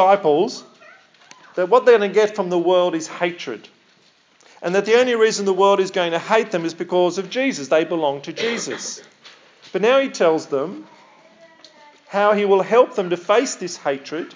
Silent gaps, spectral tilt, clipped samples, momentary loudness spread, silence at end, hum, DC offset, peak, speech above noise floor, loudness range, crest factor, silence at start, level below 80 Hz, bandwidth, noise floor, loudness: none; -4 dB/octave; under 0.1%; 13 LU; 0.05 s; none; under 0.1%; 0 dBFS; 38 dB; 4 LU; 18 dB; 0 s; -88 dBFS; 7.6 kHz; -56 dBFS; -19 LUFS